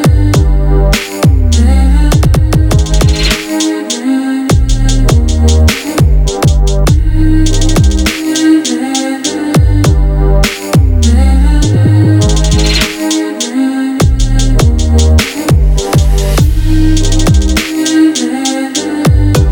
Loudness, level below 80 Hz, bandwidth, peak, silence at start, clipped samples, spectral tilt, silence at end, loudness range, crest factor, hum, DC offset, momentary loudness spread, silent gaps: -10 LUFS; -12 dBFS; 18.5 kHz; 0 dBFS; 0 s; under 0.1%; -5.5 dB/octave; 0 s; 1 LU; 8 dB; none; under 0.1%; 5 LU; none